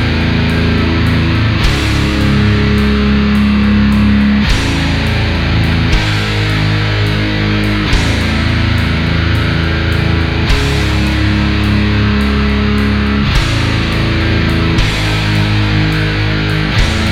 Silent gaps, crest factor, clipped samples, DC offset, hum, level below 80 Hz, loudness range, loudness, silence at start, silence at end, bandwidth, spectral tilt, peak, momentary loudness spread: none; 10 dB; under 0.1%; under 0.1%; none; -18 dBFS; 2 LU; -12 LUFS; 0 s; 0 s; 14.5 kHz; -6 dB/octave; 0 dBFS; 3 LU